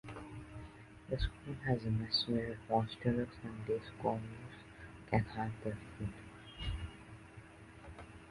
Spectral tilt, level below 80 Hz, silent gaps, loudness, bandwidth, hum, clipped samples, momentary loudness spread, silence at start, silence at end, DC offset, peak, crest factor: -7 dB/octave; -52 dBFS; none; -39 LUFS; 11.5 kHz; none; under 0.1%; 20 LU; 0.05 s; 0 s; under 0.1%; -18 dBFS; 22 dB